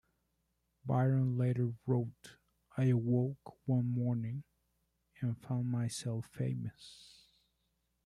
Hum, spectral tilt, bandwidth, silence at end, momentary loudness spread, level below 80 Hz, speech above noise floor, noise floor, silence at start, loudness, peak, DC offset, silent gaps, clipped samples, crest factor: none; -8 dB/octave; 11.5 kHz; 1.1 s; 15 LU; -70 dBFS; 46 dB; -81 dBFS; 0.85 s; -35 LUFS; -20 dBFS; under 0.1%; none; under 0.1%; 16 dB